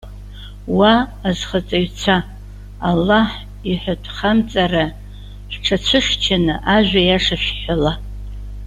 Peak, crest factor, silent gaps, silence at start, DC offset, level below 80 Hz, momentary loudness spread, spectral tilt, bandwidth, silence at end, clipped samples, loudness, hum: -2 dBFS; 16 dB; none; 0.05 s; under 0.1%; -32 dBFS; 20 LU; -5 dB/octave; 13 kHz; 0 s; under 0.1%; -17 LUFS; 50 Hz at -30 dBFS